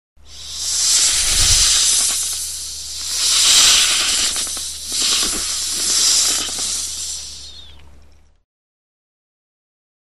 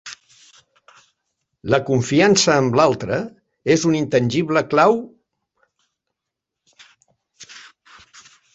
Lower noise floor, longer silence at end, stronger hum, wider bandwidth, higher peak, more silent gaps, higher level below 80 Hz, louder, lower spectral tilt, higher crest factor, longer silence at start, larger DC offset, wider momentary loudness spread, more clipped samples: second, -48 dBFS vs -83 dBFS; first, 1.65 s vs 0.95 s; neither; first, 14 kHz vs 8.4 kHz; about the same, 0 dBFS vs -2 dBFS; neither; first, -36 dBFS vs -56 dBFS; first, -14 LUFS vs -17 LUFS; second, 1.5 dB/octave vs -4.5 dB/octave; about the same, 18 dB vs 20 dB; first, 0.3 s vs 0.05 s; first, 0.9% vs under 0.1%; second, 15 LU vs 24 LU; neither